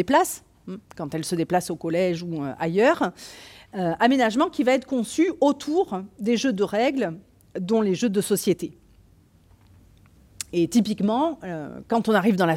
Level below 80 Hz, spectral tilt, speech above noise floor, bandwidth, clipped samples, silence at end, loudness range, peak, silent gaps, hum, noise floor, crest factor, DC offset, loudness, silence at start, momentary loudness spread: -60 dBFS; -5 dB/octave; 33 dB; 16.5 kHz; under 0.1%; 0 s; 5 LU; -6 dBFS; none; none; -56 dBFS; 18 dB; under 0.1%; -23 LUFS; 0 s; 16 LU